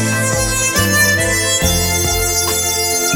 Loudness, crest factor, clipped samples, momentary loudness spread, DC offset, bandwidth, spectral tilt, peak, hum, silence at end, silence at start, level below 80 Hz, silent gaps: -13 LUFS; 14 dB; under 0.1%; 3 LU; under 0.1%; over 20 kHz; -2.5 dB/octave; 0 dBFS; none; 0 s; 0 s; -28 dBFS; none